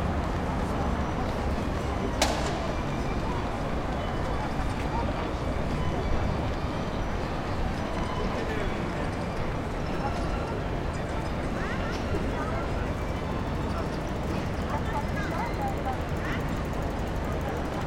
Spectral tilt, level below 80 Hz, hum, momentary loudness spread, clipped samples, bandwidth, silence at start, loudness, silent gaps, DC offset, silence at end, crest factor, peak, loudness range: -6 dB/octave; -34 dBFS; none; 2 LU; under 0.1%; 16.5 kHz; 0 s; -30 LUFS; none; under 0.1%; 0 s; 20 dB; -8 dBFS; 2 LU